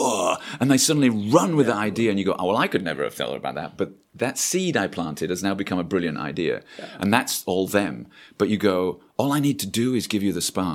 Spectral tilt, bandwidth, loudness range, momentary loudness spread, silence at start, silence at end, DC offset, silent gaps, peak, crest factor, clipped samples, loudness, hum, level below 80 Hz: -4.5 dB/octave; 16.5 kHz; 4 LU; 10 LU; 0 s; 0 s; under 0.1%; none; 0 dBFS; 22 dB; under 0.1%; -23 LUFS; none; -60 dBFS